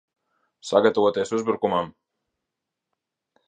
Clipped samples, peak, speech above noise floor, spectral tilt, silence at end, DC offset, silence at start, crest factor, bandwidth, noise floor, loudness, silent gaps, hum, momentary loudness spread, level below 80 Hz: under 0.1%; -4 dBFS; 62 dB; -5 dB/octave; 1.6 s; under 0.1%; 0.65 s; 22 dB; 9.6 kHz; -84 dBFS; -22 LUFS; none; none; 12 LU; -66 dBFS